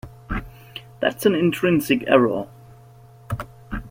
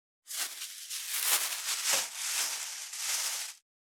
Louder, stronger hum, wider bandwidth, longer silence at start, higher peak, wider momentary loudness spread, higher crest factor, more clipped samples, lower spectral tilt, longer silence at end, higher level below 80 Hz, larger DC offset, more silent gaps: first, -21 LUFS vs -31 LUFS; neither; second, 16.5 kHz vs over 20 kHz; second, 0.05 s vs 0.25 s; first, -2 dBFS vs -10 dBFS; first, 20 LU vs 10 LU; second, 20 dB vs 26 dB; neither; first, -6 dB/octave vs 4 dB/octave; second, 0 s vs 0.25 s; first, -42 dBFS vs under -90 dBFS; neither; neither